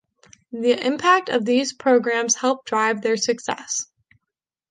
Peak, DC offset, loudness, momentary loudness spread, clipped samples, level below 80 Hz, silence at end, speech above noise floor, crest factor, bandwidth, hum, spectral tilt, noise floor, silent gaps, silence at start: -4 dBFS; under 0.1%; -20 LUFS; 9 LU; under 0.1%; -70 dBFS; 0.85 s; 63 dB; 18 dB; 10.5 kHz; none; -2 dB/octave; -84 dBFS; none; 0.5 s